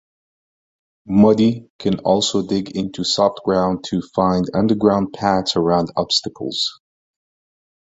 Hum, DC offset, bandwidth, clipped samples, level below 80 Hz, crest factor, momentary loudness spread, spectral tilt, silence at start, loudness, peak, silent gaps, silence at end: none; under 0.1%; 8 kHz; under 0.1%; -50 dBFS; 18 dB; 8 LU; -5.5 dB/octave; 1.05 s; -18 LUFS; 0 dBFS; 1.70-1.79 s; 1.1 s